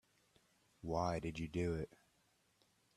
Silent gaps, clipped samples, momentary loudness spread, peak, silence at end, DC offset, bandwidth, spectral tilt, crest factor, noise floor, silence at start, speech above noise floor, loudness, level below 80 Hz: none; under 0.1%; 11 LU; -24 dBFS; 1.1 s; under 0.1%; 13 kHz; -7 dB/octave; 20 dB; -77 dBFS; 0.85 s; 36 dB; -42 LUFS; -62 dBFS